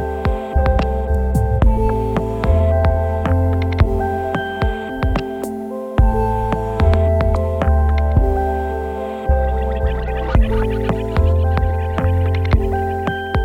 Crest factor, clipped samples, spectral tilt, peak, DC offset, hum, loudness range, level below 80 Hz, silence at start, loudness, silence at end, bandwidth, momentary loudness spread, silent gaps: 14 dB; under 0.1%; -8.5 dB/octave; -2 dBFS; under 0.1%; none; 2 LU; -20 dBFS; 0 s; -18 LUFS; 0 s; 9.8 kHz; 6 LU; none